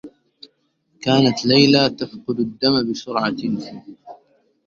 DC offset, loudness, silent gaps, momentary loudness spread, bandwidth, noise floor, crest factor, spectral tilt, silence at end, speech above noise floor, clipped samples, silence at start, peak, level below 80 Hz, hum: under 0.1%; -18 LUFS; none; 15 LU; 7.4 kHz; -65 dBFS; 20 dB; -5.5 dB/octave; 0.5 s; 46 dB; under 0.1%; 0.05 s; 0 dBFS; -58 dBFS; none